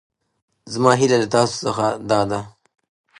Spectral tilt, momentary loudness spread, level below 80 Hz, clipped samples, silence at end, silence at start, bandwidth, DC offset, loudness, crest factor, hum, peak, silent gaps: -5 dB/octave; 9 LU; -56 dBFS; under 0.1%; 0.7 s; 0.65 s; 11.5 kHz; under 0.1%; -19 LUFS; 20 dB; none; 0 dBFS; none